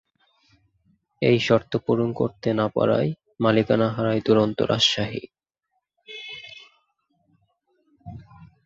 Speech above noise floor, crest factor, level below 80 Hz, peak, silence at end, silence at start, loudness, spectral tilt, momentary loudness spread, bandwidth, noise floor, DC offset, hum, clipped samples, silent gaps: 56 dB; 20 dB; -56 dBFS; -4 dBFS; 0.2 s; 1.2 s; -22 LUFS; -5.5 dB/octave; 20 LU; 7.8 kHz; -77 dBFS; under 0.1%; none; under 0.1%; none